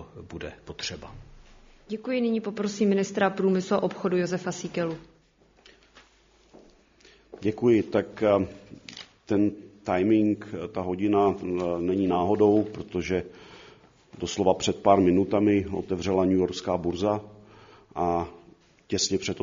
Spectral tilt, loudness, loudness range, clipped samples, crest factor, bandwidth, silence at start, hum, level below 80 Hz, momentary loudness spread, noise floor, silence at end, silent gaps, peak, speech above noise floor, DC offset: -5.5 dB/octave; -26 LUFS; 6 LU; under 0.1%; 22 dB; 7.4 kHz; 0 s; none; -56 dBFS; 17 LU; -61 dBFS; 0 s; none; -4 dBFS; 36 dB; under 0.1%